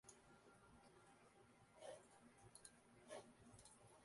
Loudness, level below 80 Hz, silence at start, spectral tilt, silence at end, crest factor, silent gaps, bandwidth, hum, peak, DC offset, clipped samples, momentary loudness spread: -65 LUFS; -84 dBFS; 0.05 s; -3.5 dB/octave; 0 s; 24 dB; none; 11.5 kHz; none; -42 dBFS; under 0.1%; under 0.1%; 9 LU